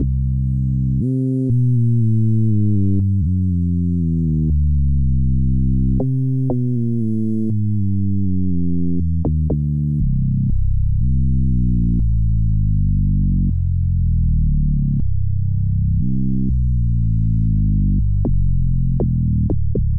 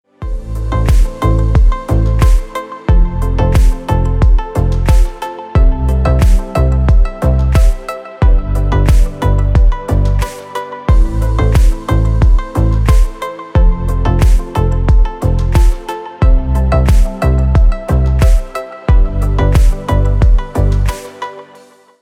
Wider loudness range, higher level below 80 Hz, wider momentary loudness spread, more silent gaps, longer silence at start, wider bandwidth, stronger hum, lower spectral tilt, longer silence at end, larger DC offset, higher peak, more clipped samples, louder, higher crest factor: about the same, 2 LU vs 1 LU; second, -22 dBFS vs -12 dBFS; second, 3 LU vs 8 LU; neither; second, 0 s vs 0.2 s; second, 1.1 kHz vs 12 kHz; neither; first, -14 dB/octave vs -7.5 dB/octave; second, 0 s vs 0.6 s; neither; second, -10 dBFS vs 0 dBFS; neither; second, -19 LUFS vs -14 LUFS; about the same, 6 dB vs 10 dB